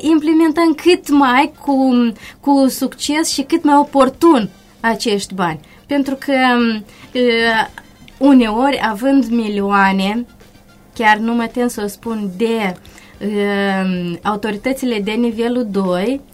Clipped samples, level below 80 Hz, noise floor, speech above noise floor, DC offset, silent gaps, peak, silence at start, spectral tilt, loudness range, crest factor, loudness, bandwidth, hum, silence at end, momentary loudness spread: under 0.1%; -48 dBFS; -44 dBFS; 30 dB; under 0.1%; none; 0 dBFS; 0 s; -5 dB/octave; 5 LU; 16 dB; -15 LUFS; 16 kHz; none; 0.1 s; 11 LU